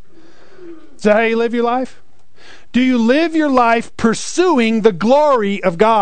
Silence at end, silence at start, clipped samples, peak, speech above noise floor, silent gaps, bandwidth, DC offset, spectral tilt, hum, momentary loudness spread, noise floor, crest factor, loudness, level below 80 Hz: 0 s; 0.6 s; under 0.1%; 0 dBFS; 33 dB; none; 9.4 kHz; 3%; -5 dB/octave; none; 6 LU; -47 dBFS; 14 dB; -14 LUFS; -50 dBFS